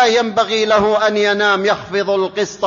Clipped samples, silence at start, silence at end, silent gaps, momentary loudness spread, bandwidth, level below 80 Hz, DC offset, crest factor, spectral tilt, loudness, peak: under 0.1%; 0 s; 0 s; none; 5 LU; 7.4 kHz; -52 dBFS; under 0.1%; 14 dB; -3.5 dB/octave; -15 LUFS; 0 dBFS